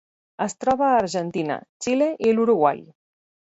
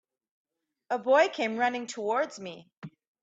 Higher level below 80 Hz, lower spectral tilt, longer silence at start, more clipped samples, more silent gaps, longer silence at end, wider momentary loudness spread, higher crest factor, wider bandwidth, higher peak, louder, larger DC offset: first, -62 dBFS vs -82 dBFS; first, -5.5 dB/octave vs -3.5 dB/octave; second, 0.4 s vs 0.9 s; neither; first, 1.69-1.80 s vs 2.77-2.82 s; first, 0.75 s vs 0.35 s; second, 10 LU vs 24 LU; about the same, 18 dB vs 20 dB; about the same, 8 kHz vs 8 kHz; first, -4 dBFS vs -10 dBFS; first, -22 LUFS vs -28 LUFS; neither